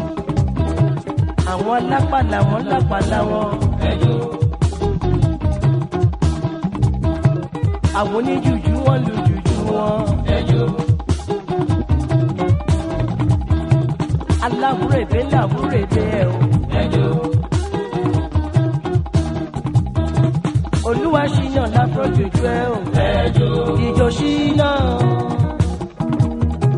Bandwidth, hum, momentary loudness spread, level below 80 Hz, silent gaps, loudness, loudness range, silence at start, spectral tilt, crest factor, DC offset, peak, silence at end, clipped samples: 11 kHz; none; 4 LU; -28 dBFS; none; -18 LUFS; 2 LU; 0 s; -7.5 dB/octave; 16 dB; under 0.1%; -2 dBFS; 0 s; under 0.1%